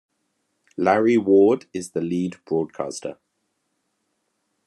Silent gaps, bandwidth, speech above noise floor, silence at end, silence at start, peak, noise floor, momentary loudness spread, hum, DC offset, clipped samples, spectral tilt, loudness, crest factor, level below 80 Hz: none; 11.5 kHz; 53 dB; 1.55 s; 0.8 s; -4 dBFS; -74 dBFS; 15 LU; none; under 0.1%; under 0.1%; -6.5 dB/octave; -21 LUFS; 20 dB; -72 dBFS